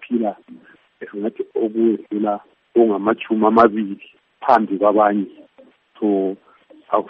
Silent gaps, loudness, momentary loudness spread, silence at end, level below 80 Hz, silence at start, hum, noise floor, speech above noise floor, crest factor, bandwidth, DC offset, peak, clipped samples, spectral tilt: none; -19 LUFS; 15 LU; 0 s; -64 dBFS; 0 s; none; -51 dBFS; 33 dB; 18 dB; 5.4 kHz; under 0.1%; 0 dBFS; under 0.1%; -5.5 dB/octave